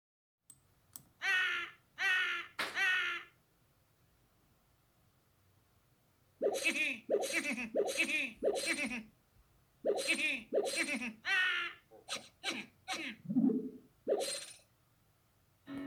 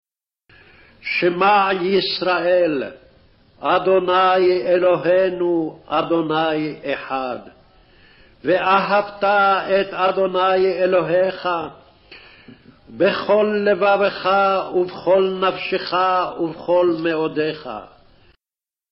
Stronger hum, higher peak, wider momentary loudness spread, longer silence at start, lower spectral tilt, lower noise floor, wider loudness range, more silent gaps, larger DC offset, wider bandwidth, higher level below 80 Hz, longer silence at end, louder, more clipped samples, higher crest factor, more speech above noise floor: neither; second, -20 dBFS vs -4 dBFS; first, 13 LU vs 9 LU; about the same, 0.95 s vs 1.05 s; about the same, -2.5 dB/octave vs -3 dB/octave; second, -72 dBFS vs under -90 dBFS; about the same, 4 LU vs 4 LU; neither; neither; first, over 20 kHz vs 5.8 kHz; second, -78 dBFS vs -58 dBFS; second, 0 s vs 1.05 s; second, -35 LUFS vs -18 LUFS; neither; about the same, 18 dB vs 14 dB; second, 36 dB vs over 72 dB